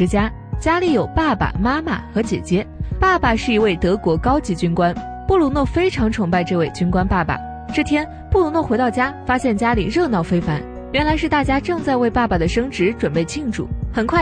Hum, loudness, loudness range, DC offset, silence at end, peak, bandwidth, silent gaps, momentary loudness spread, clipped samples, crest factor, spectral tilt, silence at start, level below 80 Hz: none; -19 LUFS; 1 LU; under 0.1%; 0 s; -4 dBFS; 10 kHz; none; 6 LU; under 0.1%; 14 dB; -6.5 dB/octave; 0 s; -30 dBFS